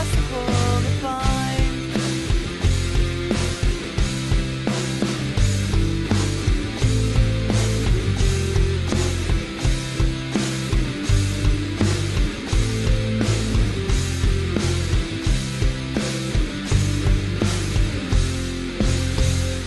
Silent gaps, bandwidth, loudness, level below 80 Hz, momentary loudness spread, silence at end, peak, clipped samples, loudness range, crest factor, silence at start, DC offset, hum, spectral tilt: none; 12.5 kHz; -22 LUFS; -24 dBFS; 3 LU; 0 s; -6 dBFS; under 0.1%; 2 LU; 14 dB; 0 s; under 0.1%; none; -5 dB/octave